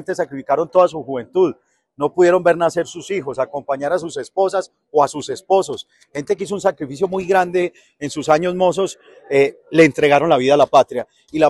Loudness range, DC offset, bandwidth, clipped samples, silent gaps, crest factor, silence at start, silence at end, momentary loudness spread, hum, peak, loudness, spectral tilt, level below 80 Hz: 5 LU; under 0.1%; 12 kHz; under 0.1%; none; 16 dB; 0 s; 0 s; 12 LU; none; 0 dBFS; -18 LUFS; -5 dB/octave; -58 dBFS